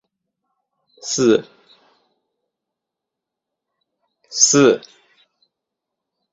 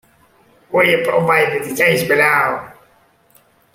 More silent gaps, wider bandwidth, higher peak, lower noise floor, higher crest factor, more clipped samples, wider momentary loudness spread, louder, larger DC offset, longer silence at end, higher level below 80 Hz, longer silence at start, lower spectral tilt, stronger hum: neither; second, 8 kHz vs 16.5 kHz; about the same, 0 dBFS vs 0 dBFS; first, -84 dBFS vs -54 dBFS; first, 22 dB vs 16 dB; neither; first, 15 LU vs 7 LU; about the same, -16 LUFS vs -14 LUFS; neither; first, 1.55 s vs 1.05 s; second, -66 dBFS vs -58 dBFS; first, 1.05 s vs 0.7 s; second, -3 dB/octave vs -4.5 dB/octave; neither